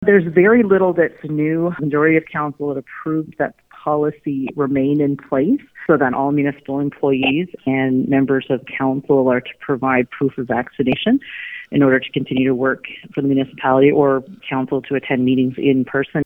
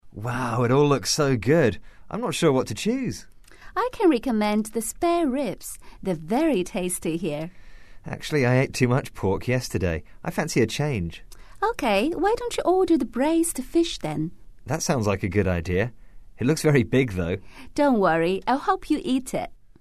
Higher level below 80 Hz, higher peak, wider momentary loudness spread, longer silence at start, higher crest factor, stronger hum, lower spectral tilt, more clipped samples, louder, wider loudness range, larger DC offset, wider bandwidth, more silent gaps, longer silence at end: second, -54 dBFS vs -46 dBFS; first, 0 dBFS vs -6 dBFS; about the same, 10 LU vs 11 LU; about the same, 0 s vs 0 s; about the same, 18 dB vs 18 dB; neither; first, -9.5 dB/octave vs -5.5 dB/octave; neither; first, -18 LUFS vs -24 LUFS; about the same, 3 LU vs 3 LU; second, under 0.1% vs 0.6%; second, 3.8 kHz vs 13.5 kHz; neither; second, 0 s vs 0.3 s